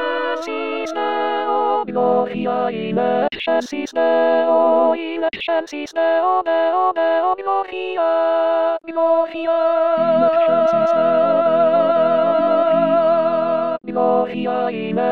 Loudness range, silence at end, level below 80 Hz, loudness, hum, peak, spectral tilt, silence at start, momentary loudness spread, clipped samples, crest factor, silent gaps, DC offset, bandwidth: 4 LU; 0 s; -64 dBFS; -18 LUFS; none; -4 dBFS; -6 dB/octave; 0 s; 7 LU; under 0.1%; 14 dB; none; 0.4%; 7.2 kHz